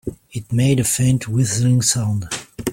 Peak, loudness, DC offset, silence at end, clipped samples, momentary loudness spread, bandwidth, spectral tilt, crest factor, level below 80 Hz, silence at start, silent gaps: -2 dBFS; -18 LUFS; under 0.1%; 0 s; under 0.1%; 11 LU; 16.5 kHz; -5 dB/octave; 16 dB; -46 dBFS; 0.05 s; none